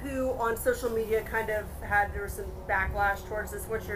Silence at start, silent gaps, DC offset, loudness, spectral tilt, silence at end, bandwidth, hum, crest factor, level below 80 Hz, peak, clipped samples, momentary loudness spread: 0 s; none; under 0.1%; -30 LUFS; -5 dB/octave; 0 s; 16 kHz; none; 16 dB; -42 dBFS; -14 dBFS; under 0.1%; 8 LU